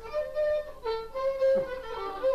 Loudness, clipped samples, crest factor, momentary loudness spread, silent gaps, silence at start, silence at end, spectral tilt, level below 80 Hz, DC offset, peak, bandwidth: -30 LUFS; under 0.1%; 12 dB; 9 LU; none; 0 s; 0 s; -5 dB/octave; -52 dBFS; under 0.1%; -18 dBFS; 13.5 kHz